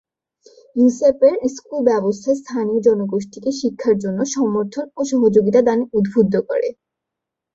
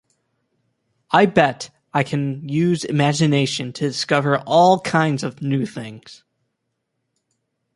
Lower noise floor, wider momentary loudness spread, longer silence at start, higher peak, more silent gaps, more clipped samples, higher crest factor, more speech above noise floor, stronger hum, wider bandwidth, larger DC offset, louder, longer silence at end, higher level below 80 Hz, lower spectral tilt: first, -83 dBFS vs -75 dBFS; about the same, 9 LU vs 10 LU; second, 0.75 s vs 1.1 s; about the same, -2 dBFS vs 0 dBFS; neither; neither; about the same, 16 dB vs 20 dB; first, 66 dB vs 57 dB; neither; second, 7.8 kHz vs 11.5 kHz; neither; about the same, -18 LUFS vs -19 LUFS; second, 0.85 s vs 1.6 s; about the same, -58 dBFS vs -60 dBFS; about the same, -6.5 dB/octave vs -5.5 dB/octave